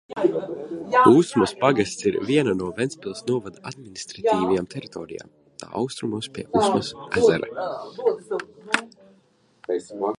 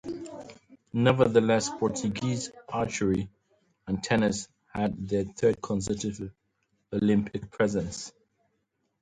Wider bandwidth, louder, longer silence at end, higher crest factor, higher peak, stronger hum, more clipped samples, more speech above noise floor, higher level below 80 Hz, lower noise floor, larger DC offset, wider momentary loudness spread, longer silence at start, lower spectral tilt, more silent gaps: first, 11.5 kHz vs 9.6 kHz; first, -23 LUFS vs -28 LUFS; second, 0 s vs 0.9 s; about the same, 20 dB vs 22 dB; first, -2 dBFS vs -6 dBFS; neither; neither; second, 38 dB vs 50 dB; about the same, -58 dBFS vs -54 dBFS; second, -61 dBFS vs -77 dBFS; neither; about the same, 17 LU vs 17 LU; about the same, 0.1 s vs 0.05 s; about the same, -5.5 dB/octave vs -5.5 dB/octave; neither